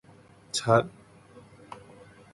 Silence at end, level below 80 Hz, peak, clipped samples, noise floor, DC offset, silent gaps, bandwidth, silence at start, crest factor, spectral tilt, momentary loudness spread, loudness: 0.6 s; -64 dBFS; -8 dBFS; under 0.1%; -55 dBFS; under 0.1%; none; 11.5 kHz; 0.55 s; 22 dB; -4.5 dB/octave; 24 LU; -26 LUFS